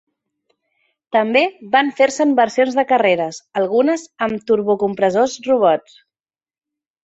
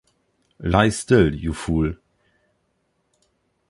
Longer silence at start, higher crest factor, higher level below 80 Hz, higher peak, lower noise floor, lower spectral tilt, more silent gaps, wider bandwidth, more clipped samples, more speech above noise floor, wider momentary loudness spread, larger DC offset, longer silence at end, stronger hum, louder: first, 1.15 s vs 0.6 s; second, 16 dB vs 22 dB; second, -62 dBFS vs -36 dBFS; about the same, -2 dBFS vs -2 dBFS; first, under -90 dBFS vs -70 dBFS; second, -4.5 dB/octave vs -6 dB/octave; neither; second, 8.2 kHz vs 11.5 kHz; neither; first, over 74 dB vs 51 dB; second, 6 LU vs 12 LU; neither; second, 1.25 s vs 1.75 s; neither; first, -17 LUFS vs -20 LUFS